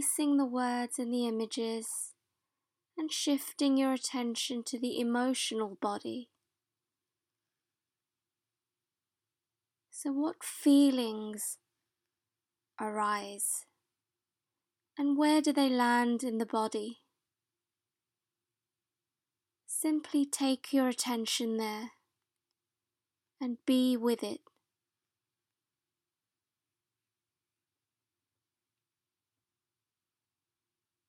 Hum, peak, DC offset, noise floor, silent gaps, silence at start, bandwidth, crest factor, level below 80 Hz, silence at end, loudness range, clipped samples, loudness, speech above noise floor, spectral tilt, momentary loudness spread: none; -16 dBFS; under 0.1%; under -90 dBFS; none; 0 s; 16.5 kHz; 18 dB; under -90 dBFS; 6.7 s; 10 LU; under 0.1%; -32 LUFS; over 59 dB; -2.5 dB/octave; 13 LU